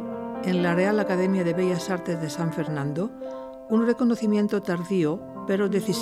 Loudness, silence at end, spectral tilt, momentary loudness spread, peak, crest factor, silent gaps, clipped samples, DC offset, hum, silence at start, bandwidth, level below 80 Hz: -25 LUFS; 0 s; -6.5 dB/octave; 9 LU; -10 dBFS; 14 dB; none; under 0.1%; under 0.1%; none; 0 s; 14.5 kHz; -62 dBFS